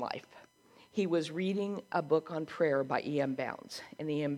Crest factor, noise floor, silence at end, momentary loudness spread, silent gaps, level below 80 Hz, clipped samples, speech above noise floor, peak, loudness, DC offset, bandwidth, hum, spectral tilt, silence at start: 18 dB; -62 dBFS; 0 s; 9 LU; none; -80 dBFS; under 0.1%; 29 dB; -16 dBFS; -34 LUFS; under 0.1%; 14.5 kHz; none; -6.5 dB/octave; 0 s